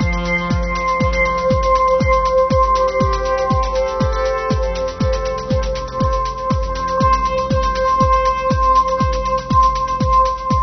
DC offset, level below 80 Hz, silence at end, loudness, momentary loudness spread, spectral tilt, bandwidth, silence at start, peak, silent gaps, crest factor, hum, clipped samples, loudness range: under 0.1%; -24 dBFS; 0 s; -17 LUFS; 6 LU; -6 dB/octave; 6.4 kHz; 0 s; -2 dBFS; none; 14 dB; none; under 0.1%; 3 LU